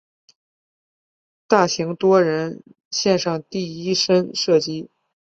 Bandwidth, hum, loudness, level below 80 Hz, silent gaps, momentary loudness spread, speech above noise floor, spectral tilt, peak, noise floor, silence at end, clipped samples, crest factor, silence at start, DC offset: 7.8 kHz; none; -20 LUFS; -64 dBFS; 2.85-2.91 s; 11 LU; over 71 dB; -4.5 dB/octave; -2 dBFS; under -90 dBFS; 0.45 s; under 0.1%; 20 dB; 1.5 s; under 0.1%